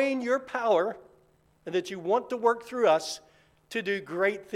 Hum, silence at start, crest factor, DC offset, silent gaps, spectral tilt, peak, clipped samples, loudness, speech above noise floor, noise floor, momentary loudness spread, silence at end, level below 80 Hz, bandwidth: none; 0 s; 18 dB; under 0.1%; none; -4 dB/octave; -10 dBFS; under 0.1%; -28 LUFS; 37 dB; -64 dBFS; 12 LU; 0 s; -72 dBFS; 15 kHz